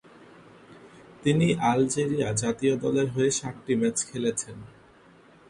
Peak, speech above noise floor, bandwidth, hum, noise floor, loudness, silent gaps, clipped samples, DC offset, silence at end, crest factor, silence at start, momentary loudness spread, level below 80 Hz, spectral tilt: -10 dBFS; 29 dB; 11.5 kHz; none; -55 dBFS; -26 LUFS; none; under 0.1%; under 0.1%; 0.8 s; 18 dB; 0.7 s; 7 LU; -60 dBFS; -5 dB/octave